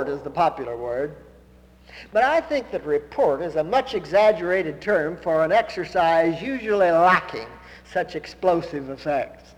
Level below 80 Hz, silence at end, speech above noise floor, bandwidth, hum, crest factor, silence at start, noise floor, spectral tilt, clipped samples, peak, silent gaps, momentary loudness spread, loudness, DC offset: -52 dBFS; 0.2 s; 29 dB; 11.5 kHz; none; 18 dB; 0 s; -51 dBFS; -6 dB/octave; under 0.1%; -4 dBFS; none; 11 LU; -22 LUFS; under 0.1%